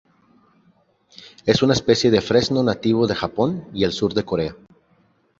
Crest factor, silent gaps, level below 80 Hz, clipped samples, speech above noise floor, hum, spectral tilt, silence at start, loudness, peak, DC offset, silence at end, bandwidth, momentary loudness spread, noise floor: 20 dB; none; -48 dBFS; under 0.1%; 41 dB; none; -5.5 dB/octave; 1.2 s; -20 LUFS; -2 dBFS; under 0.1%; 0.85 s; 7.8 kHz; 8 LU; -61 dBFS